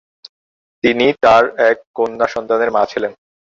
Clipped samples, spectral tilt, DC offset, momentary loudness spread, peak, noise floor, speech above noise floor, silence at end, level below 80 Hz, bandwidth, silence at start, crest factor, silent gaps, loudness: under 0.1%; -5 dB/octave; under 0.1%; 9 LU; -2 dBFS; under -90 dBFS; over 76 dB; 0.4 s; -52 dBFS; 7.6 kHz; 0.85 s; 14 dB; 1.87-1.94 s; -15 LUFS